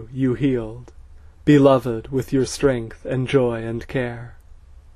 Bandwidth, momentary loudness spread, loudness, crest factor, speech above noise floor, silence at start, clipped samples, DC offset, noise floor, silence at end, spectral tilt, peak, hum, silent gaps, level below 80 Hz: 13.5 kHz; 13 LU; -20 LUFS; 20 dB; 24 dB; 0 s; under 0.1%; under 0.1%; -44 dBFS; 0.4 s; -7 dB/octave; -2 dBFS; none; none; -42 dBFS